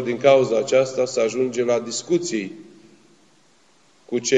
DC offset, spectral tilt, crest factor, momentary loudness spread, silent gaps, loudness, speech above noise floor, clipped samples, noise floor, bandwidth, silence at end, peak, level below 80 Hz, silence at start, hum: under 0.1%; -4 dB/octave; 20 dB; 11 LU; none; -20 LUFS; 38 dB; under 0.1%; -58 dBFS; 9.2 kHz; 0 s; -2 dBFS; -76 dBFS; 0 s; none